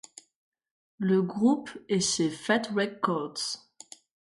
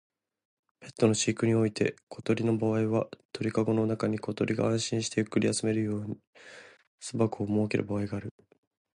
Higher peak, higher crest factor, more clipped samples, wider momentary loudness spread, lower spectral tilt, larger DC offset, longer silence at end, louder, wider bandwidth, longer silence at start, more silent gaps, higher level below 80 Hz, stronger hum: about the same, -12 dBFS vs -10 dBFS; about the same, 18 dB vs 20 dB; neither; about the same, 13 LU vs 12 LU; second, -4 dB/octave vs -5.5 dB/octave; neither; about the same, 0.75 s vs 0.65 s; about the same, -28 LUFS vs -29 LUFS; about the same, 11.5 kHz vs 11.5 kHz; first, 1 s vs 0.8 s; second, none vs 2.03-2.07 s, 3.25-3.29 s, 6.27-6.33 s, 6.87-6.98 s; second, -70 dBFS vs -62 dBFS; neither